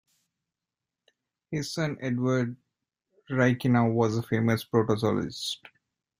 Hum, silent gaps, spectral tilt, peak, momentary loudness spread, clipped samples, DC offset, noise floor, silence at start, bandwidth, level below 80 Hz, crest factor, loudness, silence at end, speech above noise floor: none; none; -6.5 dB/octave; -10 dBFS; 10 LU; under 0.1%; under 0.1%; -89 dBFS; 1.5 s; 16 kHz; -62 dBFS; 18 dB; -27 LUFS; 0.65 s; 62 dB